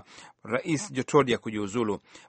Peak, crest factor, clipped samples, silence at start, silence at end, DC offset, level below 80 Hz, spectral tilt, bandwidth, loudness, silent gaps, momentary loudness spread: -6 dBFS; 22 dB; under 0.1%; 0.1 s; 0.1 s; under 0.1%; -64 dBFS; -5 dB/octave; 8.8 kHz; -28 LUFS; none; 8 LU